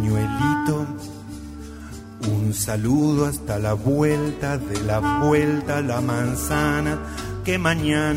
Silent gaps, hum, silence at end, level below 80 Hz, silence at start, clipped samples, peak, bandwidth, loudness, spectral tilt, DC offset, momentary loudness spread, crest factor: none; none; 0 s; -38 dBFS; 0 s; under 0.1%; -6 dBFS; 16 kHz; -22 LUFS; -6 dB/octave; under 0.1%; 16 LU; 16 dB